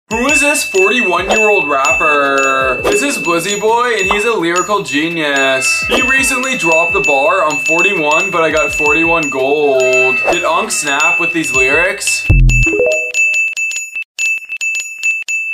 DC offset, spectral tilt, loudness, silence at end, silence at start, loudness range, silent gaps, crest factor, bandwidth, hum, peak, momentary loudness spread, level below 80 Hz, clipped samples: under 0.1%; -3 dB/octave; -11 LUFS; 0 s; 0.1 s; 2 LU; 14.05-14.15 s; 12 dB; 16 kHz; none; 0 dBFS; 5 LU; -26 dBFS; under 0.1%